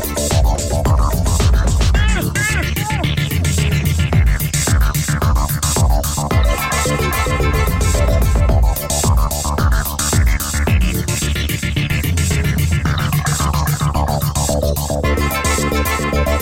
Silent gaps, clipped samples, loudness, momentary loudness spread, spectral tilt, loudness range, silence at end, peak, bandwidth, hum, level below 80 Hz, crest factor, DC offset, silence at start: none; under 0.1%; -16 LUFS; 3 LU; -4.5 dB/octave; 1 LU; 0 s; -4 dBFS; 17 kHz; none; -18 dBFS; 12 dB; under 0.1%; 0 s